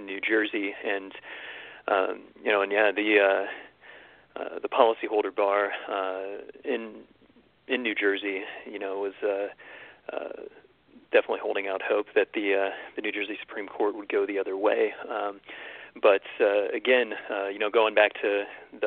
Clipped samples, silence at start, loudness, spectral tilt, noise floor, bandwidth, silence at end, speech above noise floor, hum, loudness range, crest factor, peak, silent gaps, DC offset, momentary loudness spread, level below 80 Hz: under 0.1%; 0 s; -27 LUFS; -7 dB/octave; -60 dBFS; 4.4 kHz; 0 s; 33 dB; none; 6 LU; 24 dB; -4 dBFS; none; under 0.1%; 16 LU; -74 dBFS